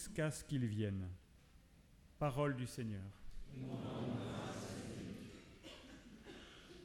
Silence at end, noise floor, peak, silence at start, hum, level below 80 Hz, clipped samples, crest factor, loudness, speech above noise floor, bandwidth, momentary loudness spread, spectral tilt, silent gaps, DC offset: 0 s; -65 dBFS; -26 dBFS; 0 s; none; -62 dBFS; under 0.1%; 20 dB; -44 LUFS; 24 dB; 17.5 kHz; 17 LU; -6 dB/octave; none; under 0.1%